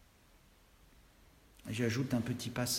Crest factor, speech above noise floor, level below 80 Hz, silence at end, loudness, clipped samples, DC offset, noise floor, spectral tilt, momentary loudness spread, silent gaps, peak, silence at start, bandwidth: 18 dB; 29 dB; -64 dBFS; 0 s; -36 LUFS; under 0.1%; under 0.1%; -64 dBFS; -4.5 dB/octave; 9 LU; none; -22 dBFS; 1.65 s; 16 kHz